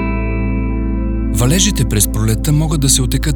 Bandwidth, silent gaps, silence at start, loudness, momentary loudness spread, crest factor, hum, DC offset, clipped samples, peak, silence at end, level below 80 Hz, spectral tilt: over 20 kHz; none; 0 s; -15 LUFS; 7 LU; 14 dB; none; under 0.1%; under 0.1%; 0 dBFS; 0 s; -20 dBFS; -4.5 dB/octave